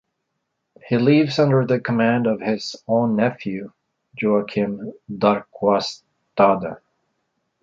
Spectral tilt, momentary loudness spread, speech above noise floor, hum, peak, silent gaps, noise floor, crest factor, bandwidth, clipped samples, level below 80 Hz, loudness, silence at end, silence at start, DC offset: -7 dB/octave; 15 LU; 57 dB; none; -2 dBFS; none; -76 dBFS; 18 dB; 7.6 kHz; under 0.1%; -62 dBFS; -20 LUFS; 0.85 s; 0.85 s; under 0.1%